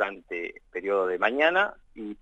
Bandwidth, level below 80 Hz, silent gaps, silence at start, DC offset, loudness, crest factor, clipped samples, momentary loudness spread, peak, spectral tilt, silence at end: 8 kHz; -62 dBFS; none; 0 s; under 0.1%; -26 LUFS; 20 dB; under 0.1%; 14 LU; -8 dBFS; -5 dB/octave; 0.05 s